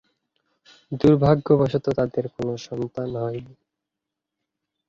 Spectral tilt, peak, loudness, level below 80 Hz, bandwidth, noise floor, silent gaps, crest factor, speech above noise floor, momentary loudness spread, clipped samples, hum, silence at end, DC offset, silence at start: -8.5 dB/octave; -4 dBFS; -22 LUFS; -52 dBFS; 7.4 kHz; -85 dBFS; none; 20 dB; 63 dB; 13 LU; under 0.1%; none; 1.4 s; under 0.1%; 0.9 s